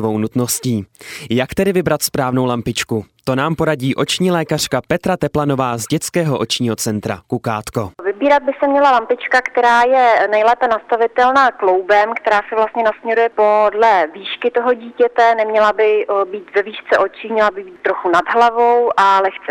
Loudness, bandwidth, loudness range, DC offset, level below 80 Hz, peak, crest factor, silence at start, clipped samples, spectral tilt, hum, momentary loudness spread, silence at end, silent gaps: -15 LUFS; 17.5 kHz; 5 LU; under 0.1%; -50 dBFS; 0 dBFS; 14 dB; 0 s; under 0.1%; -4.5 dB/octave; none; 9 LU; 0 s; none